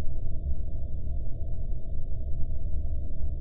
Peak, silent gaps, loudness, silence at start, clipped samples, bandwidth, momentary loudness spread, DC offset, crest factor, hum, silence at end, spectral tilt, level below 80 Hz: -14 dBFS; none; -36 LUFS; 0 s; under 0.1%; 0.7 kHz; 2 LU; under 0.1%; 10 dB; none; 0 s; -13 dB/octave; -30 dBFS